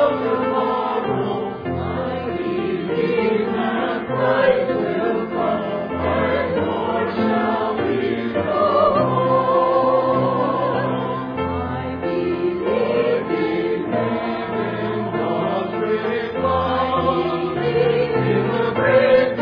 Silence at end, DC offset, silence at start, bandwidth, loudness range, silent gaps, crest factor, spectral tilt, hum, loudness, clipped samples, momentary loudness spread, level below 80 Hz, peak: 0 s; under 0.1%; 0 s; 5.2 kHz; 4 LU; none; 16 dB; -9.5 dB/octave; none; -20 LUFS; under 0.1%; 7 LU; -48 dBFS; -4 dBFS